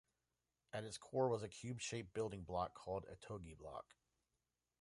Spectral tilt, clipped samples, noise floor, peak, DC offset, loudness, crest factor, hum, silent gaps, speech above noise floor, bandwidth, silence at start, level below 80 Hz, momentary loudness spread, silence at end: -5 dB/octave; under 0.1%; under -90 dBFS; -26 dBFS; under 0.1%; -46 LUFS; 22 dB; none; none; over 44 dB; 11.5 kHz; 0.75 s; -68 dBFS; 13 LU; 1 s